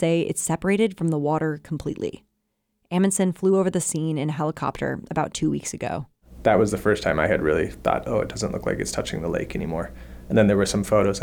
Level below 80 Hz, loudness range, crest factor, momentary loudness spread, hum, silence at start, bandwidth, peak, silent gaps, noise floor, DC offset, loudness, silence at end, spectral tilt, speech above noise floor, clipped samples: -44 dBFS; 2 LU; 16 dB; 10 LU; none; 0 s; 19 kHz; -6 dBFS; none; -75 dBFS; under 0.1%; -24 LUFS; 0 s; -5.5 dB/octave; 52 dB; under 0.1%